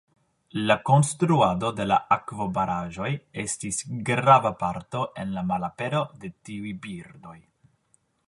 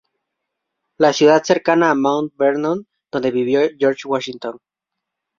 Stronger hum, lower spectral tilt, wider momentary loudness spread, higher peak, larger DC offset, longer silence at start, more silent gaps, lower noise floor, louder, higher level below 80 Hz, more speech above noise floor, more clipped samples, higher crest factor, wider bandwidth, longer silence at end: neither; about the same, -5.5 dB/octave vs -5 dB/octave; first, 16 LU vs 13 LU; about the same, -2 dBFS vs 0 dBFS; neither; second, 0.55 s vs 1 s; neither; second, -68 dBFS vs -82 dBFS; second, -25 LUFS vs -17 LUFS; first, -56 dBFS vs -64 dBFS; second, 43 dB vs 65 dB; neither; first, 24 dB vs 18 dB; first, 11.5 kHz vs 7.6 kHz; about the same, 0.9 s vs 0.85 s